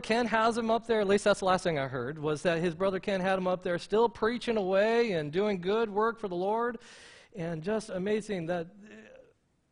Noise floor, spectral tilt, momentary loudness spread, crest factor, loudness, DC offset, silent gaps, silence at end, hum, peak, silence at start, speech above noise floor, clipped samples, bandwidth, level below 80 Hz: -65 dBFS; -5.5 dB/octave; 9 LU; 18 dB; -30 LUFS; under 0.1%; none; 0.6 s; none; -12 dBFS; 0 s; 36 dB; under 0.1%; 10.5 kHz; -60 dBFS